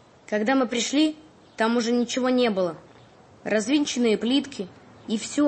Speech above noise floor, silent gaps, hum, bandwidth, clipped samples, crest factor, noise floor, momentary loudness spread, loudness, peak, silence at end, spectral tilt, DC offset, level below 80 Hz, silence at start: 28 dB; none; none; 8.8 kHz; under 0.1%; 14 dB; -51 dBFS; 15 LU; -24 LUFS; -10 dBFS; 0 s; -3.5 dB/octave; under 0.1%; -68 dBFS; 0.3 s